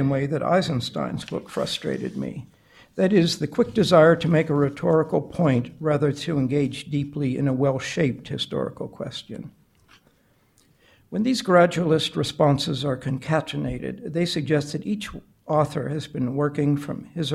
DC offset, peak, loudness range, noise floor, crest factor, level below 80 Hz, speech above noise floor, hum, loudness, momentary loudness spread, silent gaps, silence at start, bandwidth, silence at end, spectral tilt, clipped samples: under 0.1%; -4 dBFS; 7 LU; -62 dBFS; 18 dB; -54 dBFS; 39 dB; none; -23 LUFS; 13 LU; none; 0 s; 13.5 kHz; 0 s; -6.5 dB/octave; under 0.1%